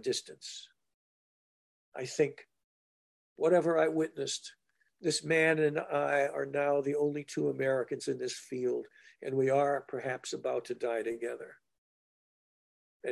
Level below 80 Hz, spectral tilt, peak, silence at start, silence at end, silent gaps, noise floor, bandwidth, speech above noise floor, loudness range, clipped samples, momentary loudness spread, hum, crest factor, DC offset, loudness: -82 dBFS; -4.5 dB/octave; -14 dBFS; 0.05 s; 0 s; 0.94-1.92 s, 2.64-3.36 s, 11.78-13.00 s; under -90 dBFS; 12.5 kHz; over 58 dB; 7 LU; under 0.1%; 16 LU; none; 20 dB; under 0.1%; -32 LUFS